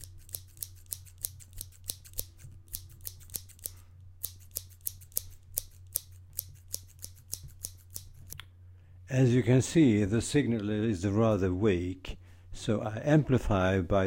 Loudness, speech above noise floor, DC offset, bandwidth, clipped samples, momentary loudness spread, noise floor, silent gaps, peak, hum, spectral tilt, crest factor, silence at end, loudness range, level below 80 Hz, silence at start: -31 LUFS; 27 dB; under 0.1%; 17 kHz; under 0.1%; 20 LU; -53 dBFS; none; -4 dBFS; none; -6 dB/octave; 28 dB; 0 s; 14 LU; -50 dBFS; 0 s